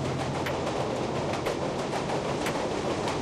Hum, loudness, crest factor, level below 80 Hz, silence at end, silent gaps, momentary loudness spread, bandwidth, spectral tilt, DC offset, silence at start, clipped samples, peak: none; -30 LUFS; 14 dB; -52 dBFS; 0 s; none; 1 LU; 14 kHz; -5 dB/octave; under 0.1%; 0 s; under 0.1%; -16 dBFS